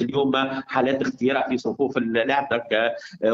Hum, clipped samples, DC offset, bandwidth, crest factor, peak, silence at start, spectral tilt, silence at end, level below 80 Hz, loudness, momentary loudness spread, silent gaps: none; under 0.1%; under 0.1%; 7.6 kHz; 16 dB; -6 dBFS; 0 s; -5.5 dB/octave; 0 s; -62 dBFS; -23 LUFS; 3 LU; none